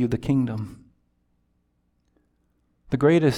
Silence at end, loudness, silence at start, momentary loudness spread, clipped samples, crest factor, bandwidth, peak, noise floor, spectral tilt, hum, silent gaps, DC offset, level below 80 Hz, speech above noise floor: 0 s; -23 LUFS; 0 s; 15 LU; under 0.1%; 20 dB; 14 kHz; -6 dBFS; -69 dBFS; -8 dB/octave; 60 Hz at -65 dBFS; none; under 0.1%; -52 dBFS; 48 dB